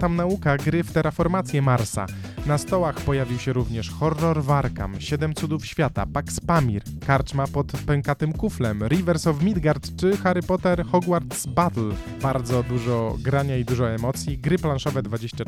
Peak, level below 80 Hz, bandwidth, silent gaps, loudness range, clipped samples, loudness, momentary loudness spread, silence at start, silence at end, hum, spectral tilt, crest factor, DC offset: -6 dBFS; -38 dBFS; 15.5 kHz; none; 2 LU; under 0.1%; -24 LUFS; 6 LU; 0 s; 0 s; none; -6.5 dB/octave; 18 dB; under 0.1%